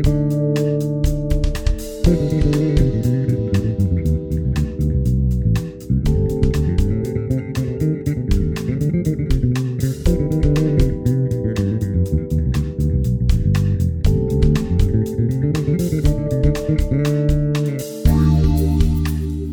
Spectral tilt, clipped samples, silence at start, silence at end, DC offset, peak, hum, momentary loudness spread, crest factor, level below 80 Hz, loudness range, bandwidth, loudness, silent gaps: -8 dB/octave; under 0.1%; 0 s; 0 s; under 0.1%; 0 dBFS; none; 4 LU; 16 dB; -22 dBFS; 2 LU; 19 kHz; -19 LUFS; none